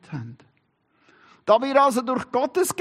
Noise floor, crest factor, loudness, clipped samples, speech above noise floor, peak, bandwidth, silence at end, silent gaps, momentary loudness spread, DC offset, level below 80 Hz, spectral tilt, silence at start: -67 dBFS; 18 dB; -21 LUFS; under 0.1%; 46 dB; -4 dBFS; 14 kHz; 0.1 s; none; 18 LU; under 0.1%; -70 dBFS; -4.5 dB/octave; 0.1 s